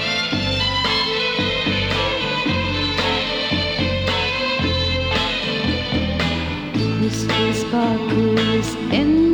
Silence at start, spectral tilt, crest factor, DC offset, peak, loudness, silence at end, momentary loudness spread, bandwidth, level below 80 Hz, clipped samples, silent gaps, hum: 0 s; -5 dB/octave; 14 dB; under 0.1%; -6 dBFS; -19 LUFS; 0 s; 3 LU; 19.5 kHz; -36 dBFS; under 0.1%; none; none